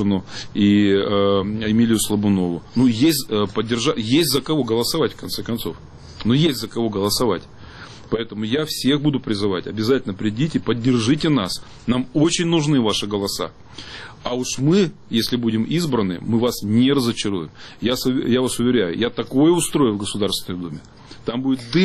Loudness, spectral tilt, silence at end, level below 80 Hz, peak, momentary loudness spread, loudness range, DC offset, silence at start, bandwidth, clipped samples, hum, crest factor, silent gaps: -20 LUFS; -5 dB/octave; 0 s; -46 dBFS; -6 dBFS; 10 LU; 3 LU; under 0.1%; 0 s; 13.5 kHz; under 0.1%; none; 14 dB; none